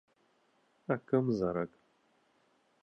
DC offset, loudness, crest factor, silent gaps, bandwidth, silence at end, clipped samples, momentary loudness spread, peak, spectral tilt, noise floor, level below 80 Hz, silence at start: under 0.1%; -34 LUFS; 22 dB; none; 6.8 kHz; 1.15 s; under 0.1%; 12 LU; -16 dBFS; -9.5 dB/octave; -72 dBFS; -68 dBFS; 0.9 s